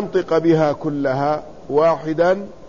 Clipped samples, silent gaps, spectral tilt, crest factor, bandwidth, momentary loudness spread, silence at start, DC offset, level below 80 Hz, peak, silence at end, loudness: under 0.1%; none; -7.5 dB/octave; 14 dB; 7.4 kHz; 6 LU; 0 s; 0.8%; -52 dBFS; -4 dBFS; 0 s; -18 LUFS